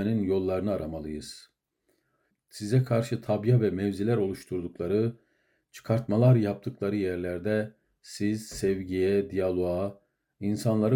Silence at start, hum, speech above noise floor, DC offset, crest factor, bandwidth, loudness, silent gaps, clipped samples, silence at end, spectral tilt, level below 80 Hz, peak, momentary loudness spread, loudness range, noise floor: 0 s; none; 48 dB; under 0.1%; 18 dB; 16.5 kHz; -28 LUFS; none; under 0.1%; 0 s; -7.5 dB/octave; -60 dBFS; -10 dBFS; 12 LU; 2 LU; -75 dBFS